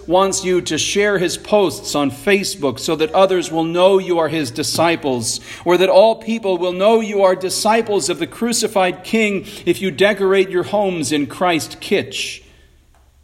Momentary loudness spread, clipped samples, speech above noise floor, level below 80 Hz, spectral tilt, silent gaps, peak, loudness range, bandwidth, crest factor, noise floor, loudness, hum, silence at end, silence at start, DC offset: 7 LU; under 0.1%; 34 dB; -50 dBFS; -3.5 dB/octave; none; 0 dBFS; 2 LU; 16 kHz; 16 dB; -51 dBFS; -17 LUFS; none; 0.85 s; 0 s; under 0.1%